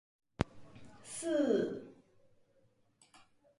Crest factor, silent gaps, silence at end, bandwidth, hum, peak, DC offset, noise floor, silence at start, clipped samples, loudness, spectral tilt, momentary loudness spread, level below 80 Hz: 28 dB; none; 1.65 s; 11.5 kHz; none; -12 dBFS; under 0.1%; -71 dBFS; 0.4 s; under 0.1%; -36 LUFS; -5.5 dB/octave; 26 LU; -58 dBFS